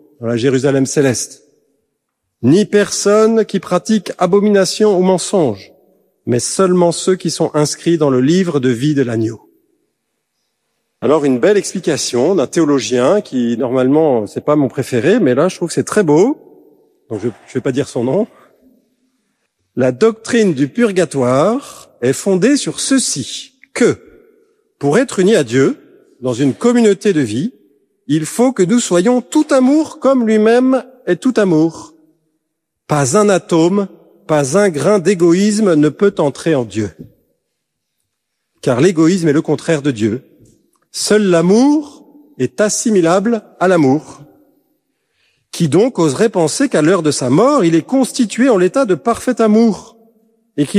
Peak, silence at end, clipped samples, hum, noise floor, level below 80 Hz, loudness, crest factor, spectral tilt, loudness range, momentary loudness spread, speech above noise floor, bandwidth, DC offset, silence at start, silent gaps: 0 dBFS; 0 s; under 0.1%; none; -73 dBFS; -58 dBFS; -14 LUFS; 14 dB; -5.5 dB/octave; 4 LU; 9 LU; 61 dB; 14.5 kHz; under 0.1%; 0.2 s; none